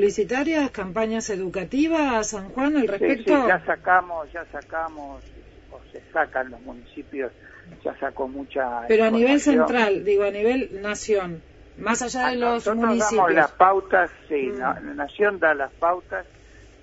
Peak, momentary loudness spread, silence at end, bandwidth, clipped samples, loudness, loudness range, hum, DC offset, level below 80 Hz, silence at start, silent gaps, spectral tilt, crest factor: -2 dBFS; 15 LU; 0.6 s; 8 kHz; under 0.1%; -22 LUFS; 10 LU; none; under 0.1%; -50 dBFS; 0 s; none; -4 dB/octave; 20 dB